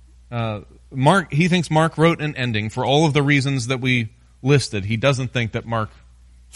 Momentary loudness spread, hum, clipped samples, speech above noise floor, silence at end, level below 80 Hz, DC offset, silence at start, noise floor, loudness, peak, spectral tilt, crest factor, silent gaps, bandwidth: 11 LU; none; under 0.1%; 28 dB; 0.65 s; -48 dBFS; under 0.1%; 0.3 s; -48 dBFS; -20 LUFS; -2 dBFS; -6 dB/octave; 18 dB; none; 11.5 kHz